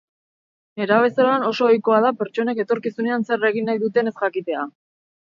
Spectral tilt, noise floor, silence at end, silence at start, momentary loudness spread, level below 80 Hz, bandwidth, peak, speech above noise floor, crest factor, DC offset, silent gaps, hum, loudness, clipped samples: -6.5 dB/octave; under -90 dBFS; 0.55 s; 0.75 s; 10 LU; -76 dBFS; 7.2 kHz; -4 dBFS; over 70 dB; 16 dB; under 0.1%; none; none; -20 LUFS; under 0.1%